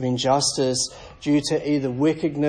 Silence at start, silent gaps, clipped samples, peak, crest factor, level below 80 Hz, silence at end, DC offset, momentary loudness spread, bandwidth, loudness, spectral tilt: 0 s; none; under 0.1%; -6 dBFS; 16 dB; -52 dBFS; 0 s; under 0.1%; 5 LU; 10.5 kHz; -22 LUFS; -4.5 dB/octave